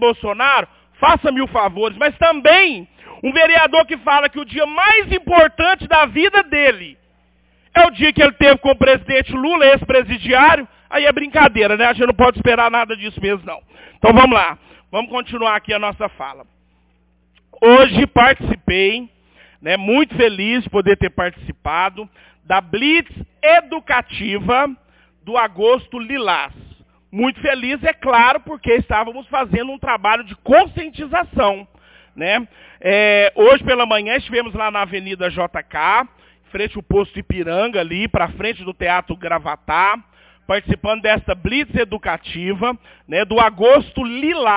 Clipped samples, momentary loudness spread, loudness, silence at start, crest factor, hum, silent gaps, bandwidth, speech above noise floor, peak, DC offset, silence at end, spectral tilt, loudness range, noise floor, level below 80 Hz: under 0.1%; 12 LU; -15 LUFS; 0 s; 16 dB; none; none; 4 kHz; 43 dB; 0 dBFS; under 0.1%; 0 s; -8.5 dB/octave; 7 LU; -58 dBFS; -38 dBFS